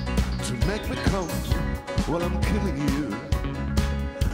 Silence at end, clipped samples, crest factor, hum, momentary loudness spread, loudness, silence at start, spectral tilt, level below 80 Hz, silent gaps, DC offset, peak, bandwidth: 0 s; under 0.1%; 16 dB; none; 3 LU; -27 LUFS; 0 s; -6 dB/octave; -30 dBFS; none; under 0.1%; -10 dBFS; 16 kHz